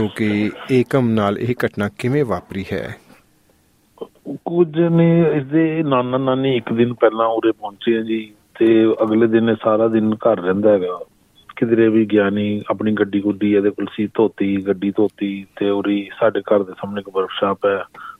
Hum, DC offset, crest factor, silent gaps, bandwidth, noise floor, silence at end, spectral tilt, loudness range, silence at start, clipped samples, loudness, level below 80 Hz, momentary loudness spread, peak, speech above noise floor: none; under 0.1%; 16 dB; none; 11.5 kHz; -57 dBFS; 0.05 s; -8.5 dB/octave; 4 LU; 0 s; under 0.1%; -18 LUFS; -58 dBFS; 11 LU; -2 dBFS; 40 dB